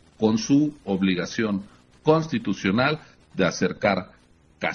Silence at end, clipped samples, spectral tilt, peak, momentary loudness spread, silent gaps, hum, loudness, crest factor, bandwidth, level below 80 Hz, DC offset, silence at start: 0 s; under 0.1%; -5.5 dB/octave; -4 dBFS; 8 LU; none; none; -24 LUFS; 20 dB; 6.8 kHz; -58 dBFS; under 0.1%; 0.2 s